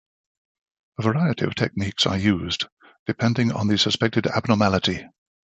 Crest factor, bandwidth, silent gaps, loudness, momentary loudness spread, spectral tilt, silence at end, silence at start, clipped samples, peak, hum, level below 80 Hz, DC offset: 20 dB; 8.4 kHz; 2.72-2.77 s, 2.99-3.06 s; -22 LUFS; 10 LU; -5.5 dB/octave; 0.4 s; 1 s; under 0.1%; -2 dBFS; none; -48 dBFS; under 0.1%